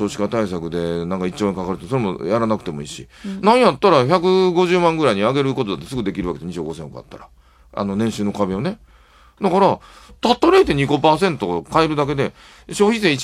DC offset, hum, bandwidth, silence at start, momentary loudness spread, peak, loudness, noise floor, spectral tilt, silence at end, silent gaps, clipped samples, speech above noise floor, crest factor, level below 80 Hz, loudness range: under 0.1%; none; 13.5 kHz; 0 s; 14 LU; 0 dBFS; -18 LUFS; -49 dBFS; -6 dB/octave; 0 s; none; under 0.1%; 31 dB; 18 dB; -46 dBFS; 8 LU